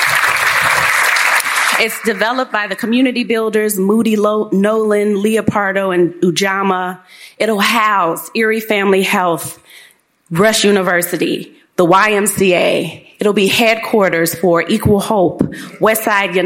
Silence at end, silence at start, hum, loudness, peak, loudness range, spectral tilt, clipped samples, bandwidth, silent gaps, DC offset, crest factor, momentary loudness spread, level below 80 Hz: 0 s; 0 s; none; -13 LUFS; 0 dBFS; 2 LU; -4 dB/octave; under 0.1%; 17 kHz; none; under 0.1%; 14 dB; 7 LU; -48 dBFS